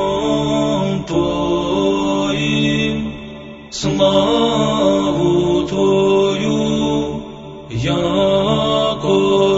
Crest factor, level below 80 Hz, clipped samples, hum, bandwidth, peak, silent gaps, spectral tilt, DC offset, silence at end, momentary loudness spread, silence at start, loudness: 14 dB; -38 dBFS; under 0.1%; none; 8 kHz; -2 dBFS; none; -5.5 dB/octave; under 0.1%; 0 s; 11 LU; 0 s; -16 LUFS